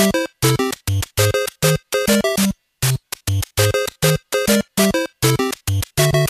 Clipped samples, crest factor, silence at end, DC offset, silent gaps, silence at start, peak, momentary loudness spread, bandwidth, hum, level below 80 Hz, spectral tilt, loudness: under 0.1%; 16 dB; 0 s; under 0.1%; none; 0 s; -2 dBFS; 5 LU; 14.5 kHz; none; -38 dBFS; -4.5 dB/octave; -18 LUFS